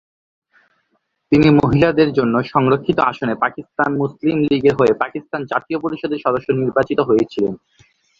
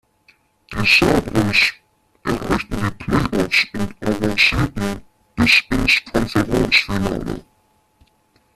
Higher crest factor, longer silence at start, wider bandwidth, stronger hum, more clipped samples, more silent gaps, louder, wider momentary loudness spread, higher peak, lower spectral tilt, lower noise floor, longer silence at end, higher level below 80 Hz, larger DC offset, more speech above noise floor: about the same, 16 dB vs 20 dB; first, 1.3 s vs 0.7 s; second, 7.4 kHz vs 14.5 kHz; neither; neither; neither; about the same, -17 LUFS vs -17 LUFS; second, 9 LU vs 13 LU; about the same, 0 dBFS vs 0 dBFS; first, -8 dB/octave vs -4.5 dB/octave; first, -68 dBFS vs -60 dBFS; second, 0.65 s vs 1.15 s; second, -46 dBFS vs -34 dBFS; neither; first, 51 dB vs 43 dB